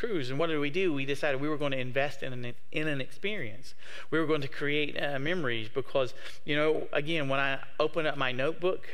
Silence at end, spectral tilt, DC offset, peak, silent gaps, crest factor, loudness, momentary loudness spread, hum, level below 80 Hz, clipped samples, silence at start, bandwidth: 0 s; -6 dB/octave; 3%; -12 dBFS; none; 18 dB; -31 LUFS; 8 LU; none; -66 dBFS; under 0.1%; 0 s; 15.5 kHz